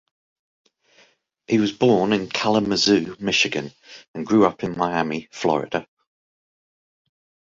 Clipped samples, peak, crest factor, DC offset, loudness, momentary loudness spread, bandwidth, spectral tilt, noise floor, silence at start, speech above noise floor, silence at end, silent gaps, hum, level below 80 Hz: under 0.1%; -2 dBFS; 20 dB; under 0.1%; -21 LUFS; 11 LU; 7.8 kHz; -4.5 dB/octave; -58 dBFS; 1.5 s; 38 dB; 1.75 s; 4.08-4.14 s; none; -58 dBFS